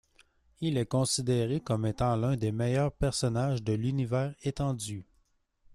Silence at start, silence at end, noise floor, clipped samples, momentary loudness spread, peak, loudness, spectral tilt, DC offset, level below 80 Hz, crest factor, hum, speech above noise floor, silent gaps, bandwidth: 0.6 s; 0.7 s; -71 dBFS; under 0.1%; 5 LU; -16 dBFS; -30 LUFS; -6 dB/octave; under 0.1%; -50 dBFS; 14 dB; none; 42 dB; none; 13 kHz